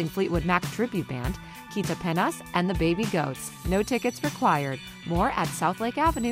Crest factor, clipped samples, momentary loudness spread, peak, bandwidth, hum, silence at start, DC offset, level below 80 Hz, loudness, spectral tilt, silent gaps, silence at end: 18 dB; under 0.1%; 8 LU; -8 dBFS; 16 kHz; none; 0 s; under 0.1%; -42 dBFS; -27 LUFS; -5.5 dB/octave; none; 0 s